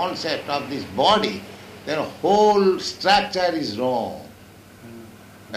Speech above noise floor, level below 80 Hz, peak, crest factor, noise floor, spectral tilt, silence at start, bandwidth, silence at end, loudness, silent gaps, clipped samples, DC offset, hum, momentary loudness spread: 25 dB; -56 dBFS; -4 dBFS; 18 dB; -46 dBFS; -4 dB/octave; 0 s; 15.5 kHz; 0 s; -21 LUFS; none; under 0.1%; under 0.1%; none; 21 LU